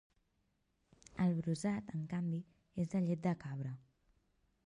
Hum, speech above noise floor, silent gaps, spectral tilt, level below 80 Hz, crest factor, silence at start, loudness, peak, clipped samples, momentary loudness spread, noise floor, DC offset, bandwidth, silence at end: none; 42 dB; none; -7.5 dB/octave; -72 dBFS; 18 dB; 1.15 s; -39 LUFS; -22 dBFS; under 0.1%; 11 LU; -80 dBFS; under 0.1%; 11 kHz; 0.9 s